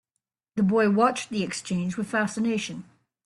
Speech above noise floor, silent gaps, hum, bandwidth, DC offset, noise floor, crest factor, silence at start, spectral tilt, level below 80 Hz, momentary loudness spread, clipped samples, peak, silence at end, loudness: 59 dB; none; none; 11.5 kHz; under 0.1%; -83 dBFS; 18 dB; 0.55 s; -5.5 dB/octave; -66 dBFS; 11 LU; under 0.1%; -8 dBFS; 0.45 s; -26 LUFS